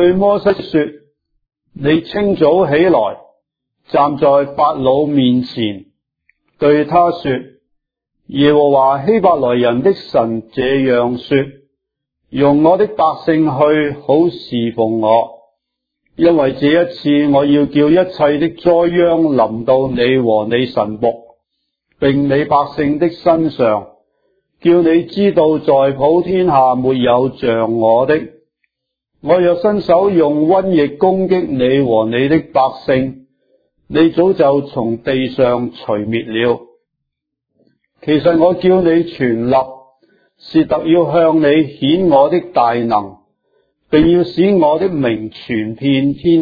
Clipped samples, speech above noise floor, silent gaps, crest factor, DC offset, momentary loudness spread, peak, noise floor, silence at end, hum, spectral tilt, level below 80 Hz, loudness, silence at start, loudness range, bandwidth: under 0.1%; 64 dB; none; 14 dB; under 0.1%; 8 LU; 0 dBFS; -76 dBFS; 0 s; none; -9.5 dB/octave; -46 dBFS; -13 LUFS; 0 s; 3 LU; 5 kHz